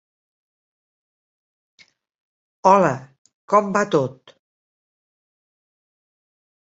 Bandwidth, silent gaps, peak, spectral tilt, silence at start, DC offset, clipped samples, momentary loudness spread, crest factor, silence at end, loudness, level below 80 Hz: 8 kHz; 3.18-3.25 s, 3.34-3.48 s; -2 dBFS; -6 dB/octave; 2.65 s; under 0.1%; under 0.1%; 10 LU; 24 dB; 2.65 s; -19 LUFS; -68 dBFS